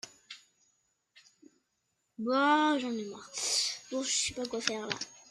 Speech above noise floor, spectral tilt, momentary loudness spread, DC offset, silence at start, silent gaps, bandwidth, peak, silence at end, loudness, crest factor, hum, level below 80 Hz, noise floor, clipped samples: 49 dB; -1.5 dB/octave; 18 LU; under 0.1%; 0.05 s; none; 13.5 kHz; -10 dBFS; 0.1 s; -31 LUFS; 24 dB; none; -72 dBFS; -80 dBFS; under 0.1%